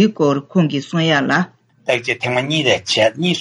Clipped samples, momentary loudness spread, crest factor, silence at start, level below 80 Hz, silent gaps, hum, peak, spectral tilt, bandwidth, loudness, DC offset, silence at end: under 0.1%; 5 LU; 14 dB; 0 s; -62 dBFS; none; none; -2 dBFS; -5 dB/octave; 11.5 kHz; -17 LUFS; under 0.1%; 0 s